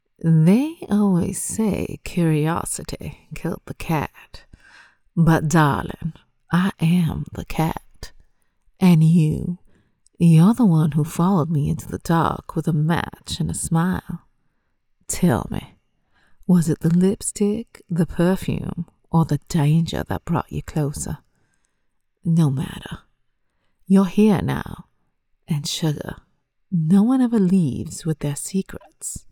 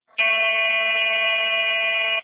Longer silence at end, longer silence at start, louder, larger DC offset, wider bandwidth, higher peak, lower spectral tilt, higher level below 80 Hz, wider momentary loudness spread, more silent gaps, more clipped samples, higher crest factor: about the same, 0.1 s vs 0 s; about the same, 0.25 s vs 0.2 s; about the same, -20 LUFS vs -18 LUFS; neither; first, 16.5 kHz vs 4 kHz; first, -4 dBFS vs -10 dBFS; first, -6.5 dB/octave vs 6 dB/octave; first, -44 dBFS vs -80 dBFS; first, 15 LU vs 2 LU; neither; neither; first, 18 dB vs 12 dB